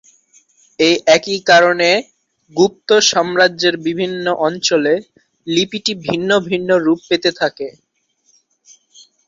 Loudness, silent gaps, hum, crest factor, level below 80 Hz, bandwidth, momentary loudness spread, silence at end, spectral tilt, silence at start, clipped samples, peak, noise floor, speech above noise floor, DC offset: -15 LUFS; none; none; 16 dB; -60 dBFS; 7.8 kHz; 9 LU; 1.6 s; -3 dB/octave; 0.8 s; under 0.1%; 0 dBFS; -61 dBFS; 46 dB; under 0.1%